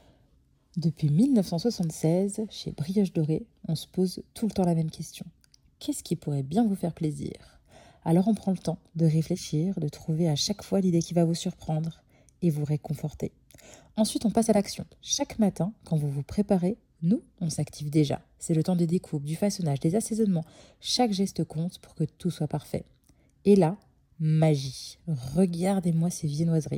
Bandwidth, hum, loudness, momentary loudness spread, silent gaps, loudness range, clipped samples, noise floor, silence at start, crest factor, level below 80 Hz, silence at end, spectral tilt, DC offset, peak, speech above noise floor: 16.5 kHz; none; -28 LUFS; 11 LU; none; 3 LU; under 0.1%; -64 dBFS; 0.75 s; 18 dB; -58 dBFS; 0 s; -6.5 dB/octave; under 0.1%; -8 dBFS; 37 dB